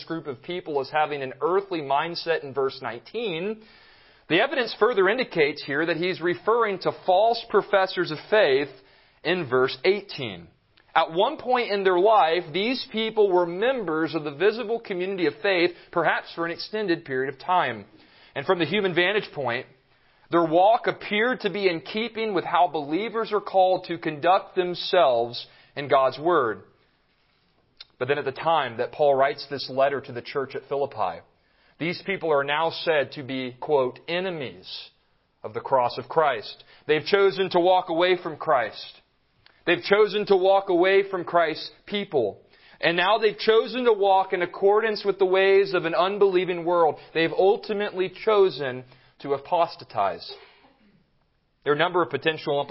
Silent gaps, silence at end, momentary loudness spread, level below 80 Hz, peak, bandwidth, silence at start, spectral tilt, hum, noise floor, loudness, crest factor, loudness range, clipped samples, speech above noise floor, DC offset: none; 0 s; 11 LU; -68 dBFS; -4 dBFS; 5.8 kHz; 0 s; -9 dB/octave; none; -67 dBFS; -24 LUFS; 20 dB; 5 LU; under 0.1%; 44 dB; under 0.1%